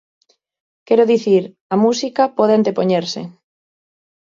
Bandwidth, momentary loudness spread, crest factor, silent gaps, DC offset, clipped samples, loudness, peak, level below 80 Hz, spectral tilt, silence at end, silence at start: 7.6 kHz; 10 LU; 16 dB; 1.61-1.70 s; under 0.1%; under 0.1%; -16 LUFS; -2 dBFS; -68 dBFS; -6 dB/octave; 1.05 s; 0.9 s